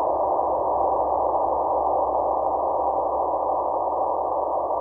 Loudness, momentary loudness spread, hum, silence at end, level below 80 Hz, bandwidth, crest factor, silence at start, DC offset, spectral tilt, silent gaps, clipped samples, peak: -23 LUFS; 2 LU; none; 0 s; -50 dBFS; 2.1 kHz; 12 dB; 0 s; under 0.1%; -11.5 dB/octave; none; under 0.1%; -10 dBFS